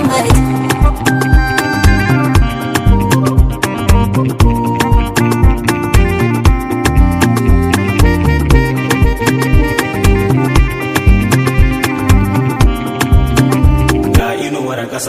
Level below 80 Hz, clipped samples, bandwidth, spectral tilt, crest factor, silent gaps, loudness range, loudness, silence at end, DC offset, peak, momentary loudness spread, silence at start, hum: -16 dBFS; 0.9%; 16 kHz; -6 dB/octave; 10 dB; none; 1 LU; -12 LUFS; 0 s; under 0.1%; 0 dBFS; 3 LU; 0 s; none